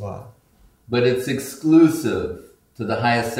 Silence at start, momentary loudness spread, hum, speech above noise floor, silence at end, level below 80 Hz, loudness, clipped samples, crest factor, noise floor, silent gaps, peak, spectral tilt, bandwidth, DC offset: 0 s; 18 LU; none; 33 dB; 0 s; -52 dBFS; -19 LUFS; under 0.1%; 18 dB; -53 dBFS; none; -4 dBFS; -6 dB/octave; 16 kHz; under 0.1%